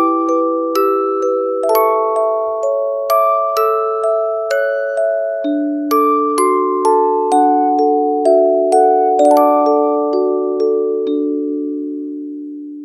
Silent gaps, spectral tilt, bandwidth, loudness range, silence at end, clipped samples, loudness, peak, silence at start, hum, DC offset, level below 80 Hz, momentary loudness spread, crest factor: none; -3 dB/octave; 15 kHz; 4 LU; 0 s; under 0.1%; -15 LUFS; 0 dBFS; 0 s; none; under 0.1%; -74 dBFS; 7 LU; 14 dB